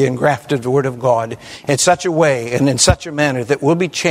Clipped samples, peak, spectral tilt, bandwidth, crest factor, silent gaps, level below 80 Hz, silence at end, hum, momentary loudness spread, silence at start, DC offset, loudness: under 0.1%; 0 dBFS; -4.5 dB/octave; 16 kHz; 16 dB; none; -36 dBFS; 0 s; none; 6 LU; 0 s; under 0.1%; -15 LUFS